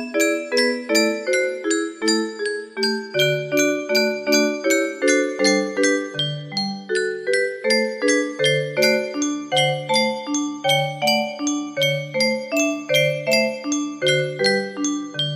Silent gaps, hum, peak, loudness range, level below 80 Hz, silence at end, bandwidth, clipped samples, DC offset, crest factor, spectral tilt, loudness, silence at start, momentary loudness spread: none; none; -2 dBFS; 1 LU; -70 dBFS; 0 s; 14.5 kHz; under 0.1%; under 0.1%; 18 dB; -3 dB/octave; -20 LUFS; 0 s; 6 LU